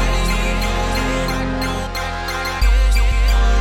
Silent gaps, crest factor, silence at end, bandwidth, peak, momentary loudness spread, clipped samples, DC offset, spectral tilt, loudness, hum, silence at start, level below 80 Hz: none; 10 dB; 0 s; 16.5 kHz; -6 dBFS; 6 LU; under 0.1%; under 0.1%; -4.5 dB/octave; -19 LUFS; none; 0 s; -18 dBFS